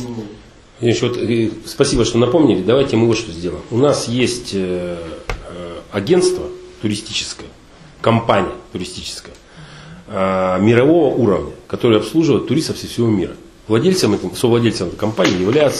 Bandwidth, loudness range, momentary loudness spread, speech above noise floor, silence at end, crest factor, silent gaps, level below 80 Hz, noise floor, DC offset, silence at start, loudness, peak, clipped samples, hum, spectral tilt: 13.5 kHz; 5 LU; 15 LU; 24 dB; 0 s; 16 dB; none; -40 dBFS; -40 dBFS; under 0.1%; 0 s; -17 LUFS; 0 dBFS; under 0.1%; none; -5.5 dB/octave